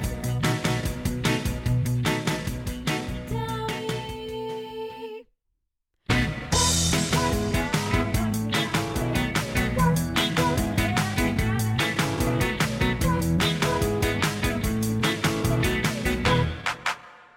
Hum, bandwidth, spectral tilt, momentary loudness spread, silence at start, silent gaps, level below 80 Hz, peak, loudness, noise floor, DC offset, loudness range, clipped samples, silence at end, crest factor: none; 17.5 kHz; -4.5 dB/octave; 8 LU; 0 s; none; -36 dBFS; -10 dBFS; -25 LUFS; -77 dBFS; under 0.1%; 6 LU; under 0.1%; 0.15 s; 16 dB